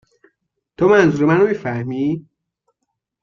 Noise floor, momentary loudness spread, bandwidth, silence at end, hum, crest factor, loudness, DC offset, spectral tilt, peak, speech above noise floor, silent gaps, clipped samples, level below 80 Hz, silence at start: -76 dBFS; 10 LU; 7.2 kHz; 1 s; none; 16 dB; -16 LUFS; under 0.1%; -7.5 dB/octave; -2 dBFS; 61 dB; none; under 0.1%; -56 dBFS; 0.8 s